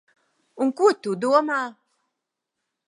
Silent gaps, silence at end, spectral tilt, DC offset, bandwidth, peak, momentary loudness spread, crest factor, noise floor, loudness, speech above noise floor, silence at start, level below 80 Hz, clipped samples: none; 1.15 s; -5 dB/octave; under 0.1%; 11.5 kHz; -6 dBFS; 7 LU; 20 dB; -83 dBFS; -22 LUFS; 61 dB; 0.55 s; -84 dBFS; under 0.1%